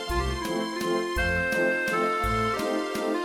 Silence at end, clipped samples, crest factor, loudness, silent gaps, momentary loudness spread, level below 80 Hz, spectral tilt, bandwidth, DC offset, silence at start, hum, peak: 0 s; under 0.1%; 14 dB; -26 LUFS; none; 4 LU; -38 dBFS; -4.5 dB/octave; 19 kHz; under 0.1%; 0 s; none; -14 dBFS